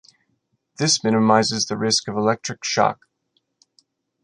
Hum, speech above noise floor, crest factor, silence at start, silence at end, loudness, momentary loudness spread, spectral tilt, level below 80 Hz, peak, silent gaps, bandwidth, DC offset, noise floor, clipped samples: none; 51 dB; 20 dB; 0.8 s; 1.3 s; -20 LUFS; 7 LU; -3.5 dB/octave; -64 dBFS; -2 dBFS; none; 11 kHz; under 0.1%; -71 dBFS; under 0.1%